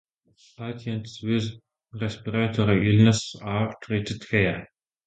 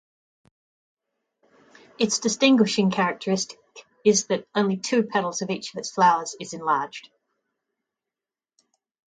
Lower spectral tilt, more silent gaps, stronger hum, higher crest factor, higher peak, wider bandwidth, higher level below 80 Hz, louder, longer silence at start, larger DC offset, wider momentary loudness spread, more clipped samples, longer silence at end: first, -6 dB/octave vs -4 dB/octave; neither; neither; about the same, 20 dB vs 20 dB; about the same, -4 dBFS vs -6 dBFS; about the same, 9.2 kHz vs 9.6 kHz; first, -50 dBFS vs -72 dBFS; about the same, -25 LUFS vs -23 LUFS; second, 0.6 s vs 2 s; neither; first, 16 LU vs 11 LU; neither; second, 0.4 s vs 2.15 s